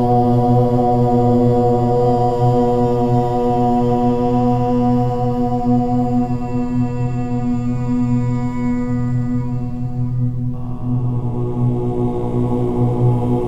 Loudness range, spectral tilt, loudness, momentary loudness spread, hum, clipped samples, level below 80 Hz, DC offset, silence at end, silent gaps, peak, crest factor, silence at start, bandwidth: 6 LU; -10 dB/octave; -17 LUFS; 7 LU; none; under 0.1%; -30 dBFS; under 0.1%; 0 s; none; -4 dBFS; 12 dB; 0 s; 7.8 kHz